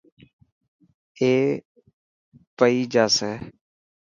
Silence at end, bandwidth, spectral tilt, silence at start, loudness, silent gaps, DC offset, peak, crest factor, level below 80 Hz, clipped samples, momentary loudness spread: 0.65 s; 7.6 kHz; -4 dB/octave; 1.2 s; -21 LUFS; 1.65-1.75 s, 1.94-2.32 s, 2.47-2.57 s; under 0.1%; -2 dBFS; 22 dB; -64 dBFS; under 0.1%; 14 LU